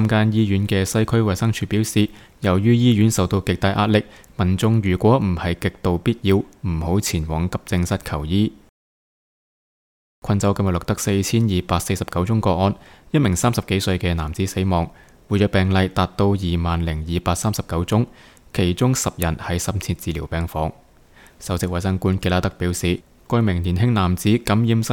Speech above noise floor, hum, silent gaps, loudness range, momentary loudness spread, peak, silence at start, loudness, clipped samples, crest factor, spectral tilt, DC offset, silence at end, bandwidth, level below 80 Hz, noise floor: 30 dB; none; 8.69-10.22 s; 5 LU; 7 LU; -4 dBFS; 0 s; -20 LUFS; under 0.1%; 16 dB; -6 dB/octave; under 0.1%; 0 s; 18 kHz; -38 dBFS; -49 dBFS